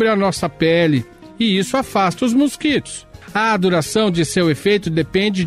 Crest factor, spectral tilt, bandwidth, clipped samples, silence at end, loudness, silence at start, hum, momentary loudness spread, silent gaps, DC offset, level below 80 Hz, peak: 12 dB; -5 dB/octave; 15 kHz; under 0.1%; 0 s; -17 LUFS; 0 s; none; 6 LU; none; under 0.1%; -46 dBFS; -6 dBFS